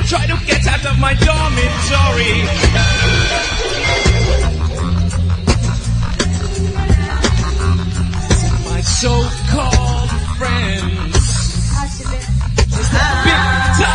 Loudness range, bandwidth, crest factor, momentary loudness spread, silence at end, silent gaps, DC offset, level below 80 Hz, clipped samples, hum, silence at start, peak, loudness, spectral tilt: 3 LU; 10.5 kHz; 14 dB; 6 LU; 0 s; none; under 0.1%; -18 dBFS; under 0.1%; none; 0 s; 0 dBFS; -15 LUFS; -4.5 dB/octave